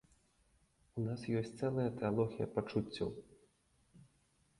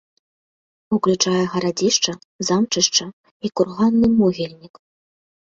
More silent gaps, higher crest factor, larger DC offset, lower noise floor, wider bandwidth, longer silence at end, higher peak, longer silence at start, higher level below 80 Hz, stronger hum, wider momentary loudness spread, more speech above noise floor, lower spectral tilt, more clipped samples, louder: second, none vs 2.25-2.39 s, 3.13-3.24 s, 3.31-3.40 s; about the same, 20 dB vs 18 dB; neither; second, -74 dBFS vs under -90 dBFS; first, 11.5 kHz vs 7.8 kHz; second, 0.55 s vs 0.8 s; second, -20 dBFS vs -2 dBFS; about the same, 0.95 s vs 0.9 s; second, -66 dBFS vs -56 dBFS; neither; second, 7 LU vs 12 LU; second, 37 dB vs over 71 dB; first, -8 dB/octave vs -4 dB/octave; neither; second, -39 LUFS vs -19 LUFS